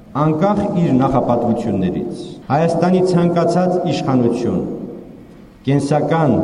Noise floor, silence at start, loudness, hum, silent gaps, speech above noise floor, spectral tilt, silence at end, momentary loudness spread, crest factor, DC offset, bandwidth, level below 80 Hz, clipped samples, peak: -40 dBFS; 0 s; -16 LUFS; none; none; 24 dB; -8 dB/octave; 0 s; 11 LU; 14 dB; under 0.1%; 11 kHz; -44 dBFS; under 0.1%; -2 dBFS